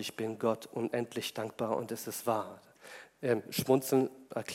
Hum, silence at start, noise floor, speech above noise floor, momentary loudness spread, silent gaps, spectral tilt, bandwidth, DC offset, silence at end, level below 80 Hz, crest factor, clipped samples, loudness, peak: none; 0 s; -53 dBFS; 20 dB; 16 LU; none; -5 dB/octave; 16 kHz; under 0.1%; 0 s; -78 dBFS; 22 dB; under 0.1%; -34 LUFS; -12 dBFS